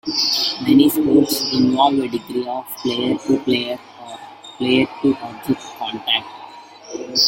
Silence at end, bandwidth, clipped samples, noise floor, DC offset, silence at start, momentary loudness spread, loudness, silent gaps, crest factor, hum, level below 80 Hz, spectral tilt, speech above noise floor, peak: 0 s; 16.5 kHz; under 0.1%; -39 dBFS; under 0.1%; 0.05 s; 21 LU; -18 LUFS; none; 18 dB; none; -58 dBFS; -4 dB/octave; 21 dB; -2 dBFS